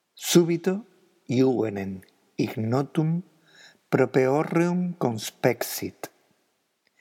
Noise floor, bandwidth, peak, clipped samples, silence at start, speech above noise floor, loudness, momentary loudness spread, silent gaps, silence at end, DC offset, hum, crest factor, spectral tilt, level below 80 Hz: -72 dBFS; 17.5 kHz; -4 dBFS; under 0.1%; 0.15 s; 48 dB; -25 LUFS; 14 LU; none; 0.95 s; under 0.1%; none; 22 dB; -5.5 dB/octave; -78 dBFS